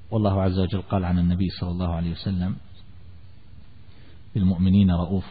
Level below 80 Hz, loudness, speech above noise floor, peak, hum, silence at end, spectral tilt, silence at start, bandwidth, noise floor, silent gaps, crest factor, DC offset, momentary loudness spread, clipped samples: -42 dBFS; -24 LUFS; 26 dB; -10 dBFS; none; 0 s; -12.5 dB/octave; 0.1 s; 4.9 kHz; -48 dBFS; none; 14 dB; 0.8%; 9 LU; under 0.1%